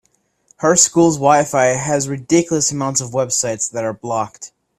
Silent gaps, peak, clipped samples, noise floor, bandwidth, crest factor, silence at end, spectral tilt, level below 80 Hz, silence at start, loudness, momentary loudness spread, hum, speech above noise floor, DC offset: none; 0 dBFS; under 0.1%; -57 dBFS; 14.5 kHz; 18 dB; 0.3 s; -3.5 dB/octave; -54 dBFS; 0.6 s; -16 LUFS; 10 LU; none; 41 dB; under 0.1%